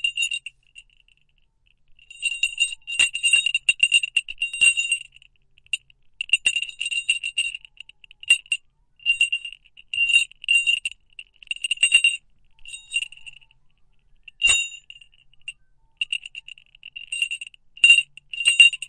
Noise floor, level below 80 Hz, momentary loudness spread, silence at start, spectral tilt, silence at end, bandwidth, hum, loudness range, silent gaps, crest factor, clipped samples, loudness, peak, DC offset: -63 dBFS; -60 dBFS; 22 LU; 0.05 s; 4.5 dB/octave; 0.05 s; 11.5 kHz; none; 7 LU; none; 22 dB; under 0.1%; -20 LUFS; -2 dBFS; under 0.1%